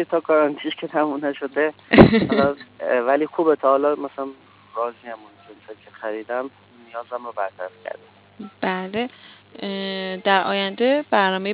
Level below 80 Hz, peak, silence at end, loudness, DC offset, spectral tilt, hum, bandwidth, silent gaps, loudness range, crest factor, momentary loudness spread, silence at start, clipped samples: -46 dBFS; 0 dBFS; 0 s; -21 LUFS; under 0.1%; -10 dB/octave; none; 4 kHz; none; 14 LU; 22 dB; 18 LU; 0 s; under 0.1%